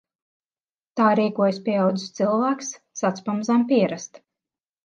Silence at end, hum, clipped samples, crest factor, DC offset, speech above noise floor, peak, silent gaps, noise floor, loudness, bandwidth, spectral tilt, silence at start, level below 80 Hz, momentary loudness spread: 0.8 s; none; under 0.1%; 18 dB; under 0.1%; over 68 dB; -6 dBFS; none; under -90 dBFS; -22 LUFS; 7.6 kHz; -5.5 dB/octave; 0.95 s; -76 dBFS; 12 LU